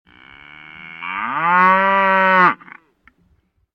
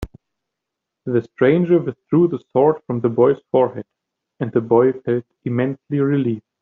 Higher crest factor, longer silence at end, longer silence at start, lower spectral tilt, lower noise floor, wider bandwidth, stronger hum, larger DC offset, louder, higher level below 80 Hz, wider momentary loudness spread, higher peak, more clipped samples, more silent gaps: about the same, 18 dB vs 16 dB; first, 1.2 s vs 0.2 s; first, 0.55 s vs 0 s; second, -6.5 dB/octave vs -8 dB/octave; second, -61 dBFS vs -82 dBFS; first, 6.4 kHz vs 4.1 kHz; neither; neither; first, -14 LUFS vs -19 LUFS; second, -64 dBFS vs -50 dBFS; first, 18 LU vs 8 LU; about the same, 0 dBFS vs -2 dBFS; neither; neither